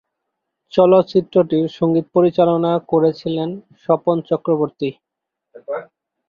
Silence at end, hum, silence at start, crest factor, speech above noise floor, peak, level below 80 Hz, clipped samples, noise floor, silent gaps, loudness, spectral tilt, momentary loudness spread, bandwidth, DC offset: 0.45 s; none; 0.75 s; 16 dB; 65 dB; -2 dBFS; -62 dBFS; under 0.1%; -81 dBFS; none; -17 LUFS; -9 dB/octave; 14 LU; 6.8 kHz; under 0.1%